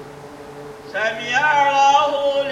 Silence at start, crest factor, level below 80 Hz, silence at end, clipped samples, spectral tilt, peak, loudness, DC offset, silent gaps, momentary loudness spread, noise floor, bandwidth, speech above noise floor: 0 s; 14 dB; -58 dBFS; 0 s; under 0.1%; -2 dB/octave; -4 dBFS; -17 LUFS; under 0.1%; none; 23 LU; -37 dBFS; 11.5 kHz; 20 dB